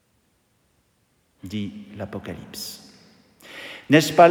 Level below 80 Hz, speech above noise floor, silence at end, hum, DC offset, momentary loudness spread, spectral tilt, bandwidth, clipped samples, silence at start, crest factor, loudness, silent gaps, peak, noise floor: -64 dBFS; 46 dB; 0 s; none; under 0.1%; 23 LU; -5 dB/octave; 20 kHz; under 0.1%; 1.45 s; 22 dB; -23 LUFS; none; -2 dBFS; -66 dBFS